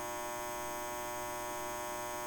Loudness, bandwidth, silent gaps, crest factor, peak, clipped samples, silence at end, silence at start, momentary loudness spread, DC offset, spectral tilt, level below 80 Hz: -39 LUFS; 17 kHz; none; 10 dB; -30 dBFS; under 0.1%; 0 s; 0 s; 0 LU; under 0.1%; -2.5 dB/octave; -60 dBFS